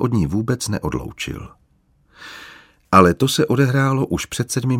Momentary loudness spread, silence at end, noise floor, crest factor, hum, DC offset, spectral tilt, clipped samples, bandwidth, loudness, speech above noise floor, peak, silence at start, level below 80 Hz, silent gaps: 22 LU; 0 s; -59 dBFS; 20 dB; none; under 0.1%; -5.5 dB/octave; under 0.1%; 16.5 kHz; -18 LUFS; 41 dB; 0 dBFS; 0 s; -42 dBFS; none